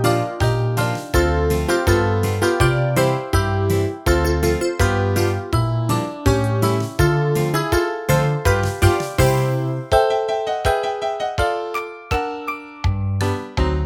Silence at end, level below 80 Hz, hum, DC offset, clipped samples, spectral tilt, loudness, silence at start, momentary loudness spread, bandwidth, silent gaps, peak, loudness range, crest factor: 0 s; -30 dBFS; none; under 0.1%; under 0.1%; -6 dB/octave; -19 LUFS; 0 s; 6 LU; 19 kHz; none; -2 dBFS; 3 LU; 18 dB